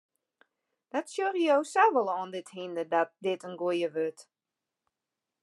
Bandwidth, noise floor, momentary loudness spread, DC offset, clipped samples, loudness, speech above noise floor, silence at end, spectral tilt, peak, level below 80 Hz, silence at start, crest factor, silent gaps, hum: 12 kHz; -89 dBFS; 12 LU; under 0.1%; under 0.1%; -29 LUFS; 60 dB; 1.2 s; -4.5 dB/octave; -10 dBFS; under -90 dBFS; 0.95 s; 20 dB; none; none